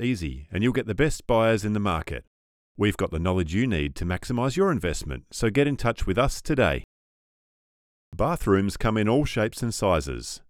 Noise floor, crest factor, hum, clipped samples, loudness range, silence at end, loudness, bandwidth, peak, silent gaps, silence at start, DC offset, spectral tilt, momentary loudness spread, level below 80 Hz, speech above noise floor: under -90 dBFS; 18 dB; none; under 0.1%; 1 LU; 0.1 s; -25 LUFS; 16.5 kHz; -8 dBFS; 2.27-2.75 s, 6.84-8.12 s; 0 s; under 0.1%; -6 dB/octave; 8 LU; -38 dBFS; over 66 dB